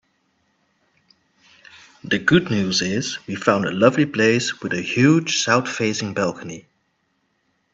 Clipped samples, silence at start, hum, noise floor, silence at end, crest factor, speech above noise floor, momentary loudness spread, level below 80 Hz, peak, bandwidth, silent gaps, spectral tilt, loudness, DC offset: under 0.1%; 2.05 s; none; -69 dBFS; 1.15 s; 22 dB; 49 dB; 9 LU; -58 dBFS; 0 dBFS; 8.4 kHz; none; -4.5 dB/octave; -19 LUFS; under 0.1%